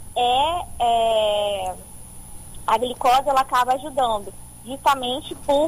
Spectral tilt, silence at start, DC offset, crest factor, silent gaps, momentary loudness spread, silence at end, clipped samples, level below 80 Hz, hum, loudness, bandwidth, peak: -3 dB/octave; 0 s; under 0.1%; 14 dB; none; 21 LU; 0 s; under 0.1%; -44 dBFS; 60 Hz at -50 dBFS; -21 LUFS; 15.5 kHz; -8 dBFS